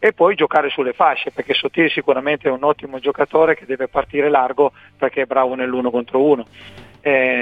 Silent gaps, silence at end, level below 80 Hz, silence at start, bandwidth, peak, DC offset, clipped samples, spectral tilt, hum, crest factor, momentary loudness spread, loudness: none; 0 s; -54 dBFS; 0 s; 5 kHz; 0 dBFS; under 0.1%; under 0.1%; -6.5 dB/octave; none; 16 dB; 6 LU; -18 LUFS